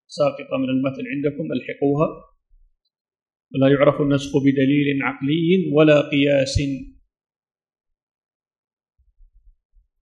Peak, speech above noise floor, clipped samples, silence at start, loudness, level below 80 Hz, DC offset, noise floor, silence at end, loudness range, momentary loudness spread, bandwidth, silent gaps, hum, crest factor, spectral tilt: -2 dBFS; 38 dB; under 0.1%; 0.1 s; -19 LUFS; -46 dBFS; under 0.1%; -57 dBFS; 3.15 s; 7 LU; 10 LU; 9.8 kHz; 3.01-3.05 s; none; 18 dB; -6.5 dB/octave